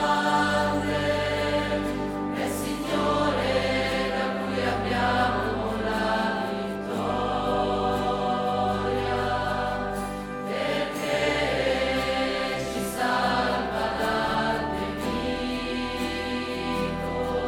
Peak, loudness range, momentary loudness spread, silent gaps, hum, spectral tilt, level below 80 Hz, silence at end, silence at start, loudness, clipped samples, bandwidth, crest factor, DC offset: -12 dBFS; 2 LU; 5 LU; none; none; -5 dB/octave; -42 dBFS; 0 s; 0 s; -26 LUFS; under 0.1%; 19 kHz; 14 dB; under 0.1%